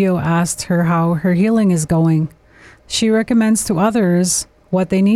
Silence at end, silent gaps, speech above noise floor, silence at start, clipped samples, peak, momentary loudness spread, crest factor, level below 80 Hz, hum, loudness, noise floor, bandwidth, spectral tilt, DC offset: 0 s; none; 31 dB; 0 s; under 0.1%; -6 dBFS; 5 LU; 10 dB; -44 dBFS; none; -16 LUFS; -45 dBFS; 15 kHz; -5.5 dB/octave; under 0.1%